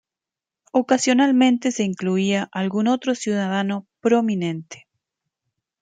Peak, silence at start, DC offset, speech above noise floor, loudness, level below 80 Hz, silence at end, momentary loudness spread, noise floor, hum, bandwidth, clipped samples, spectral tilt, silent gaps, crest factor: -4 dBFS; 0.75 s; under 0.1%; 69 dB; -21 LUFS; -70 dBFS; 1.05 s; 9 LU; -89 dBFS; none; 9.4 kHz; under 0.1%; -5 dB/octave; none; 18 dB